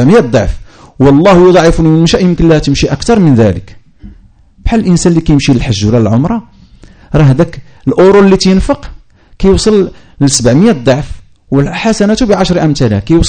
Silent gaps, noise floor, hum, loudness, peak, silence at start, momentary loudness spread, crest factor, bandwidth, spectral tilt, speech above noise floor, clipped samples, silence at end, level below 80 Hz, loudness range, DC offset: none; -40 dBFS; none; -8 LUFS; 0 dBFS; 0 s; 10 LU; 8 dB; 9.6 kHz; -6 dB/octave; 33 dB; 2%; 0 s; -22 dBFS; 3 LU; under 0.1%